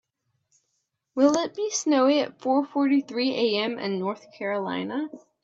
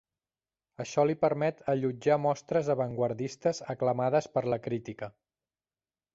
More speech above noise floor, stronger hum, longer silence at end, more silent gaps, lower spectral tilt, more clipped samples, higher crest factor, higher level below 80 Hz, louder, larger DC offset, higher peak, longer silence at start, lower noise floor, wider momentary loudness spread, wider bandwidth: second, 53 dB vs over 61 dB; neither; second, 0.25 s vs 1.05 s; neither; second, -4 dB/octave vs -6.5 dB/octave; neither; about the same, 18 dB vs 18 dB; second, -76 dBFS vs -68 dBFS; first, -25 LUFS vs -30 LUFS; neither; first, -8 dBFS vs -12 dBFS; first, 1.15 s vs 0.8 s; second, -77 dBFS vs under -90 dBFS; about the same, 11 LU vs 9 LU; about the same, 7.8 kHz vs 7.8 kHz